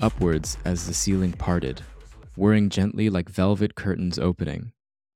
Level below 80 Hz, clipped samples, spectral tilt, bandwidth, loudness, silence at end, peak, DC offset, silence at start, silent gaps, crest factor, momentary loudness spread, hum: -40 dBFS; under 0.1%; -5.5 dB/octave; 15 kHz; -24 LUFS; 0.45 s; -6 dBFS; under 0.1%; 0 s; none; 18 dB; 11 LU; none